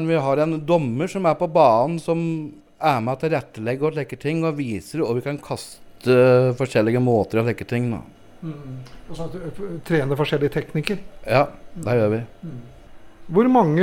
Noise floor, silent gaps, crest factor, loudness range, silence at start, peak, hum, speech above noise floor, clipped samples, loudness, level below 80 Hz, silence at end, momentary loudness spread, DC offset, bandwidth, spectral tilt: -40 dBFS; none; 18 dB; 6 LU; 0 s; -2 dBFS; none; 20 dB; under 0.1%; -21 LUFS; -50 dBFS; 0 s; 18 LU; under 0.1%; 17 kHz; -7.5 dB/octave